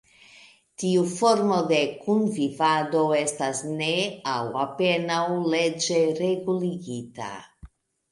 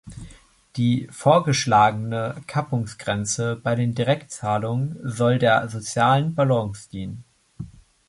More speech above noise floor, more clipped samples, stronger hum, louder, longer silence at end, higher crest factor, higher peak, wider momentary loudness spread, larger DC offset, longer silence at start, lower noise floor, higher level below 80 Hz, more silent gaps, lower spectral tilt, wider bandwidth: about the same, 29 dB vs 27 dB; neither; neither; about the same, -24 LUFS vs -22 LUFS; about the same, 0.45 s vs 0.4 s; about the same, 18 dB vs 20 dB; about the same, -6 dBFS vs -4 dBFS; second, 10 LU vs 18 LU; neither; first, 0.8 s vs 0.05 s; first, -53 dBFS vs -49 dBFS; second, -62 dBFS vs -52 dBFS; neither; about the same, -4.5 dB/octave vs -5.5 dB/octave; about the same, 11.5 kHz vs 11.5 kHz